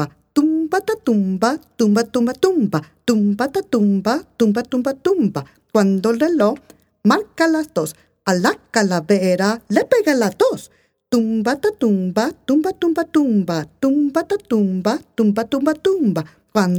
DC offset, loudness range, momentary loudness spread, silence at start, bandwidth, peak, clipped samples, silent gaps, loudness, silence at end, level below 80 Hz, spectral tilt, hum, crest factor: under 0.1%; 1 LU; 5 LU; 0 s; 18.5 kHz; 0 dBFS; under 0.1%; none; -18 LUFS; 0 s; -58 dBFS; -6 dB/octave; none; 16 dB